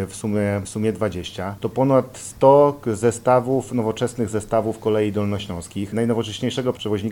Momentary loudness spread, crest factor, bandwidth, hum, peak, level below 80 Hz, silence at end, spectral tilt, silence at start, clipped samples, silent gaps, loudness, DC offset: 11 LU; 20 dB; 18 kHz; none; 0 dBFS; -50 dBFS; 0 s; -6 dB/octave; 0 s; under 0.1%; none; -21 LUFS; under 0.1%